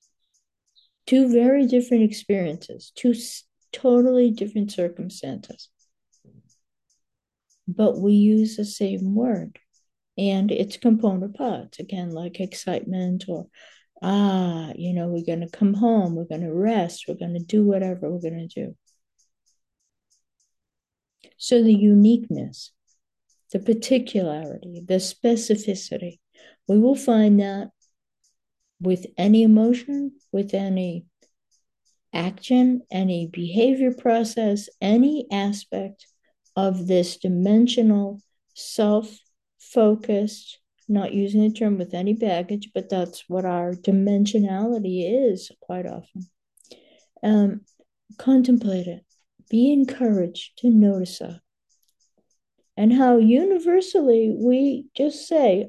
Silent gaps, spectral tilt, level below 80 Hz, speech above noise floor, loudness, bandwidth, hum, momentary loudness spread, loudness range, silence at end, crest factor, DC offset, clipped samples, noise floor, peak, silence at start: none; -7 dB/octave; -70 dBFS; 66 dB; -21 LUFS; 12.5 kHz; none; 16 LU; 6 LU; 0 s; 16 dB; under 0.1%; under 0.1%; -86 dBFS; -6 dBFS; 1.05 s